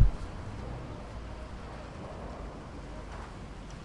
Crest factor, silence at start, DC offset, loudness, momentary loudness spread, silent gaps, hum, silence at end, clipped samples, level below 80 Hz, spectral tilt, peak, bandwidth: 22 dB; 0 s; under 0.1%; -41 LUFS; 3 LU; none; none; 0 s; under 0.1%; -38 dBFS; -7 dB/octave; -12 dBFS; 10.5 kHz